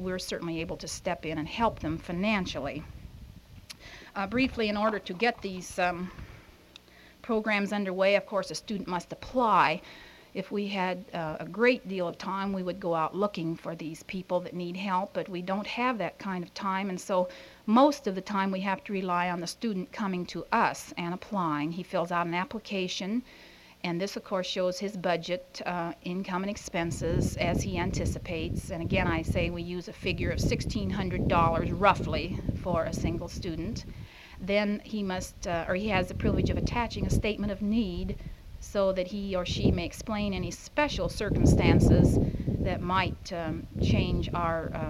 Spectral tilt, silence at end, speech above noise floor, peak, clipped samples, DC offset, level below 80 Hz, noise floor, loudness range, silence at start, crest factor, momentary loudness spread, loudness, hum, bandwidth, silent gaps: -6 dB/octave; 0 s; 25 dB; -8 dBFS; under 0.1%; under 0.1%; -42 dBFS; -54 dBFS; 6 LU; 0 s; 22 dB; 11 LU; -30 LUFS; none; 15.5 kHz; none